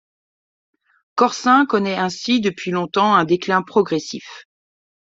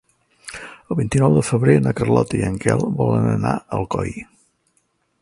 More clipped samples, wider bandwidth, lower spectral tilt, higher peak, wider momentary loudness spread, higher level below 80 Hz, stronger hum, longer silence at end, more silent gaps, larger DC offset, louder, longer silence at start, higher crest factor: neither; second, 7.8 kHz vs 11.5 kHz; second, -5 dB/octave vs -7 dB/octave; about the same, -2 dBFS vs 0 dBFS; second, 12 LU vs 18 LU; second, -64 dBFS vs -44 dBFS; neither; second, 0.75 s vs 1 s; neither; neither; about the same, -18 LUFS vs -19 LUFS; first, 1.15 s vs 0.45 s; about the same, 18 dB vs 20 dB